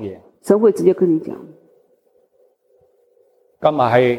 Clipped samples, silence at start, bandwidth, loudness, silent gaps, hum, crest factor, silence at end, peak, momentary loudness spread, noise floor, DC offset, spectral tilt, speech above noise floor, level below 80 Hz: under 0.1%; 0 s; 12.5 kHz; -16 LUFS; none; none; 18 dB; 0 s; -2 dBFS; 19 LU; -59 dBFS; under 0.1%; -7 dB/octave; 43 dB; -62 dBFS